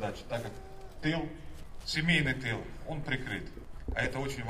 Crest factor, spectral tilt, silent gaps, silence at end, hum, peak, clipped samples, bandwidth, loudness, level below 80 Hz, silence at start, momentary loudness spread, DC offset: 20 dB; -5 dB/octave; none; 0 s; none; -14 dBFS; under 0.1%; 15 kHz; -34 LUFS; -46 dBFS; 0 s; 20 LU; under 0.1%